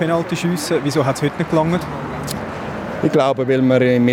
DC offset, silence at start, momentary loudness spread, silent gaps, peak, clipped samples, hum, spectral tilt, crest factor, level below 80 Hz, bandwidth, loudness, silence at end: under 0.1%; 0 s; 12 LU; none; -2 dBFS; under 0.1%; none; -6 dB/octave; 16 dB; -46 dBFS; 16.5 kHz; -18 LUFS; 0 s